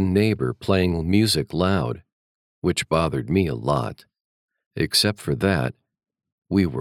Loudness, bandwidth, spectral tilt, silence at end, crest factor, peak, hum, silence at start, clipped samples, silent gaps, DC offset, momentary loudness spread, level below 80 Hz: -22 LUFS; 16.5 kHz; -5.5 dB/octave; 0 s; 18 dB; -4 dBFS; none; 0 s; under 0.1%; 2.12-2.62 s, 4.21-4.48 s, 4.66-4.71 s, 6.32-6.42 s; under 0.1%; 9 LU; -48 dBFS